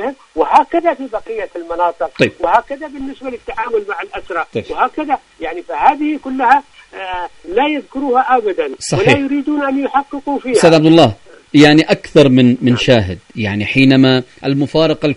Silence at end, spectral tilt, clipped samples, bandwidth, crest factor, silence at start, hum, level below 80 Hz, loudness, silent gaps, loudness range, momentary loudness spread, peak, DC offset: 0 s; -6 dB/octave; 0.2%; 11 kHz; 14 dB; 0 s; none; -44 dBFS; -13 LUFS; none; 8 LU; 15 LU; 0 dBFS; under 0.1%